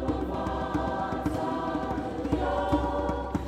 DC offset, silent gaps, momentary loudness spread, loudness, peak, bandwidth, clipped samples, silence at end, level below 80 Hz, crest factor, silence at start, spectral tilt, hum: under 0.1%; none; 4 LU; -30 LUFS; -12 dBFS; 14 kHz; under 0.1%; 0 s; -38 dBFS; 16 dB; 0 s; -7.5 dB/octave; none